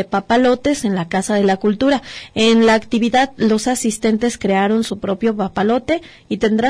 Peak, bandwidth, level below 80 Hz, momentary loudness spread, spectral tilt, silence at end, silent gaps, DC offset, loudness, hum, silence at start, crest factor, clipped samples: -4 dBFS; 11 kHz; -46 dBFS; 6 LU; -4.5 dB/octave; 0 s; none; under 0.1%; -16 LUFS; none; 0 s; 12 dB; under 0.1%